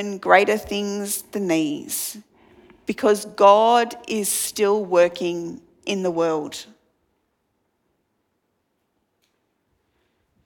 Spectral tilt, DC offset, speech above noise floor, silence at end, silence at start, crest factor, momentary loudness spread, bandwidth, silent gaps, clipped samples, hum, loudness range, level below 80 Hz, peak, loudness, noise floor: -3.5 dB/octave; under 0.1%; 52 dB; 3.85 s; 0 s; 22 dB; 16 LU; 19 kHz; none; under 0.1%; none; 10 LU; -62 dBFS; 0 dBFS; -20 LUFS; -72 dBFS